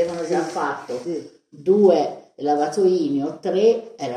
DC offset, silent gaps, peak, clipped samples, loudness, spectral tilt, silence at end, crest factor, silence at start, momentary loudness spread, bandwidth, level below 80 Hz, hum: under 0.1%; none; -4 dBFS; under 0.1%; -21 LUFS; -6 dB/octave; 0 s; 16 dB; 0 s; 12 LU; 11 kHz; -70 dBFS; none